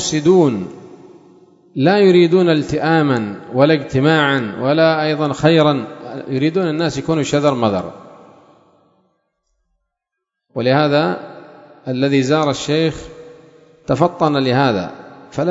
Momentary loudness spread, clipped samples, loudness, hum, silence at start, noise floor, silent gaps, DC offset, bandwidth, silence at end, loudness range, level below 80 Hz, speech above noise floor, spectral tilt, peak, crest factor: 16 LU; under 0.1%; -15 LUFS; none; 0 s; -79 dBFS; none; under 0.1%; 8 kHz; 0 s; 7 LU; -50 dBFS; 65 dB; -6 dB/octave; 0 dBFS; 16 dB